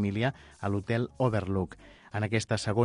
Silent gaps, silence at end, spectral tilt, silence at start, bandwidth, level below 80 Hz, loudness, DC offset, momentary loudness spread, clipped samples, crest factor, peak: none; 0 s; -6.5 dB/octave; 0 s; 11 kHz; -50 dBFS; -31 LUFS; under 0.1%; 10 LU; under 0.1%; 16 dB; -12 dBFS